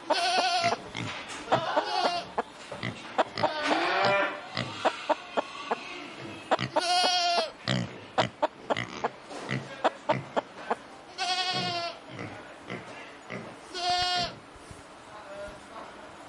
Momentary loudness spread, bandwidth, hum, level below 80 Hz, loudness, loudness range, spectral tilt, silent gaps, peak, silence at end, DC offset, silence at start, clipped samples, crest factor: 18 LU; 11.5 kHz; none; -64 dBFS; -29 LUFS; 5 LU; -3.5 dB/octave; none; -10 dBFS; 0 s; under 0.1%; 0 s; under 0.1%; 20 dB